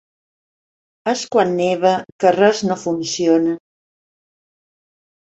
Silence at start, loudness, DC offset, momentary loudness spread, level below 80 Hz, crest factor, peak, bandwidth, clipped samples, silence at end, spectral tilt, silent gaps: 1.05 s; -17 LUFS; under 0.1%; 8 LU; -62 dBFS; 18 dB; -2 dBFS; 8.2 kHz; under 0.1%; 1.8 s; -4.5 dB/octave; 2.12-2.19 s